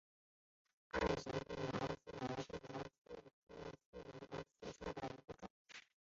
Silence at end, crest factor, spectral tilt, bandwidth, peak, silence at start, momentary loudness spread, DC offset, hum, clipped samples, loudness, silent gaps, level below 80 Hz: 0.3 s; 24 dB; -4.5 dB/octave; 7.6 kHz; -24 dBFS; 0.95 s; 16 LU; under 0.1%; none; under 0.1%; -47 LUFS; 2.98-3.05 s, 3.33-3.47 s, 3.86-3.93 s, 5.50-5.65 s; -64 dBFS